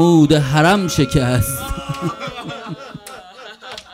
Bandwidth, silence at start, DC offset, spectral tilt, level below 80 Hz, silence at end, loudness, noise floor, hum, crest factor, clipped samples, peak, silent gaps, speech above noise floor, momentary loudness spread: 16 kHz; 0 s; under 0.1%; -5.5 dB/octave; -34 dBFS; 0.1 s; -16 LUFS; -37 dBFS; none; 18 dB; under 0.1%; 0 dBFS; none; 23 dB; 22 LU